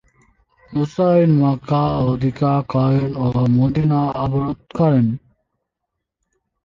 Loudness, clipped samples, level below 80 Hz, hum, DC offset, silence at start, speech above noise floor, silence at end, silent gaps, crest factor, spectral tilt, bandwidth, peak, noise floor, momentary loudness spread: -18 LUFS; under 0.1%; -44 dBFS; none; under 0.1%; 0.7 s; 63 dB; 1.5 s; none; 14 dB; -10 dB/octave; 7 kHz; -4 dBFS; -79 dBFS; 8 LU